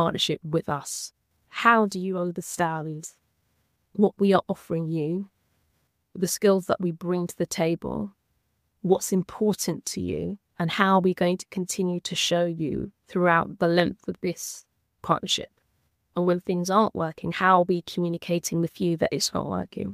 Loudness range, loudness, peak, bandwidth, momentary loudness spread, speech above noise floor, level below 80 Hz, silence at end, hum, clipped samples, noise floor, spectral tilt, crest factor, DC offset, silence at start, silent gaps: 3 LU; -25 LUFS; -2 dBFS; 15.5 kHz; 13 LU; 48 dB; -58 dBFS; 0 s; none; under 0.1%; -73 dBFS; -4.5 dB/octave; 24 dB; under 0.1%; 0 s; none